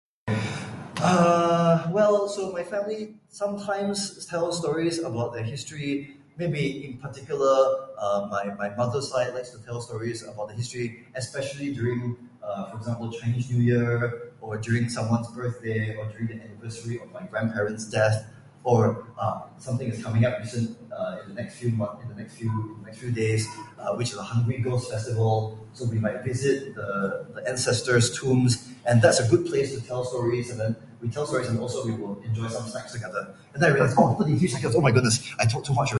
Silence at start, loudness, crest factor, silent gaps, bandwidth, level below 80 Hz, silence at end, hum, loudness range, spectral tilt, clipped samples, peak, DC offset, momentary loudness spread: 0.25 s; -26 LUFS; 22 dB; none; 11.5 kHz; -56 dBFS; 0 s; none; 7 LU; -5.5 dB/octave; under 0.1%; -4 dBFS; under 0.1%; 14 LU